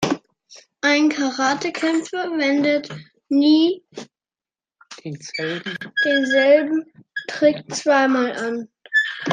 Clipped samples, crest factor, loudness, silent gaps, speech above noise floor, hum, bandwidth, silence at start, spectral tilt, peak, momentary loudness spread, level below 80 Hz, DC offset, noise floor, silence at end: under 0.1%; 16 dB; -19 LUFS; none; over 71 dB; none; 9.6 kHz; 0 s; -4 dB/octave; -4 dBFS; 16 LU; -68 dBFS; under 0.1%; under -90 dBFS; 0 s